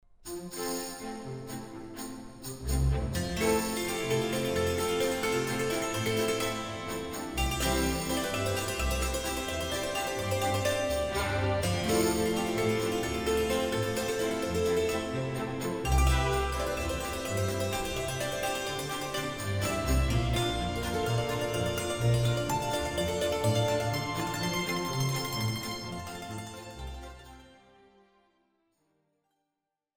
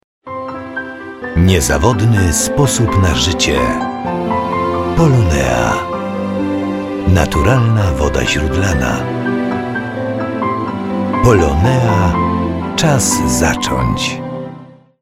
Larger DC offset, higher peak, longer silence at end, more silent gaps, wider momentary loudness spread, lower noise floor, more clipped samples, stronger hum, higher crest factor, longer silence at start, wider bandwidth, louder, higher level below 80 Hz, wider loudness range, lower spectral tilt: neither; second, -16 dBFS vs 0 dBFS; first, 2.45 s vs 0.35 s; neither; about the same, 11 LU vs 9 LU; first, -86 dBFS vs -36 dBFS; neither; neither; about the same, 16 dB vs 14 dB; about the same, 0.25 s vs 0.25 s; first, over 20 kHz vs 16 kHz; second, -30 LUFS vs -14 LUFS; second, -40 dBFS vs -26 dBFS; first, 5 LU vs 2 LU; about the same, -4.5 dB/octave vs -5 dB/octave